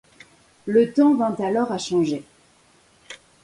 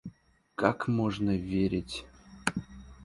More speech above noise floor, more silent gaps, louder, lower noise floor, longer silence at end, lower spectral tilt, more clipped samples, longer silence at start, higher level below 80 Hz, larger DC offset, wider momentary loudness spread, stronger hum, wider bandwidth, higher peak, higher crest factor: first, 37 dB vs 27 dB; neither; first, -21 LUFS vs -31 LUFS; about the same, -57 dBFS vs -57 dBFS; first, 0.3 s vs 0 s; about the same, -6 dB/octave vs -6 dB/octave; neither; first, 0.65 s vs 0.05 s; second, -64 dBFS vs -52 dBFS; neither; first, 24 LU vs 14 LU; neither; about the same, 11.5 kHz vs 11.5 kHz; about the same, -6 dBFS vs -8 dBFS; second, 16 dB vs 24 dB